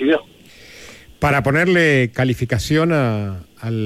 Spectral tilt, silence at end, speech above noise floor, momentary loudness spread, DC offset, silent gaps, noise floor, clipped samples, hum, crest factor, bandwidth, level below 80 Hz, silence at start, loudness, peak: -6.5 dB/octave; 0 s; 27 dB; 13 LU; under 0.1%; none; -44 dBFS; under 0.1%; none; 14 dB; 15.5 kHz; -42 dBFS; 0 s; -17 LUFS; -4 dBFS